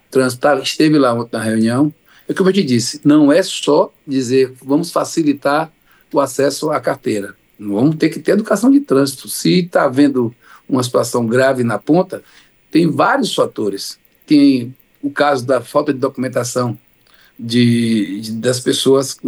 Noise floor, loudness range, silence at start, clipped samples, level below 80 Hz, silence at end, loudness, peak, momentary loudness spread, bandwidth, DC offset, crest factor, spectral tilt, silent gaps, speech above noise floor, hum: -50 dBFS; 3 LU; 0.1 s; under 0.1%; -64 dBFS; 0 s; -15 LUFS; -2 dBFS; 9 LU; 20 kHz; under 0.1%; 14 dB; -5.5 dB/octave; none; 36 dB; none